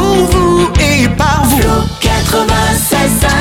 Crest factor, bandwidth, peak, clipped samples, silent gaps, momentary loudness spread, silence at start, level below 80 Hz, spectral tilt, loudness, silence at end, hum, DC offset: 10 dB; 18.5 kHz; 0 dBFS; under 0.1%; none; 3 LU; 0 s; -18 dBFS; -4.5 dB/octave; -10 LUFS; 0 s; none; under 0.1%